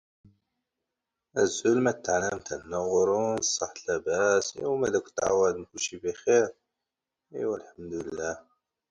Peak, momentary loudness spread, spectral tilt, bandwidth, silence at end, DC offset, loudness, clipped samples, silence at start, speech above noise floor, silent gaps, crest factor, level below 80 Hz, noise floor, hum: -12 dBFS; 11 LU; -3.5 dB/octave; 9.6 kHz; 0.5 s; under 0.1%; -28 LUFS; under 0.1%; 1.35 s; 60 dB; none; 18 dB; -62 dBFS; -87 dBFS; none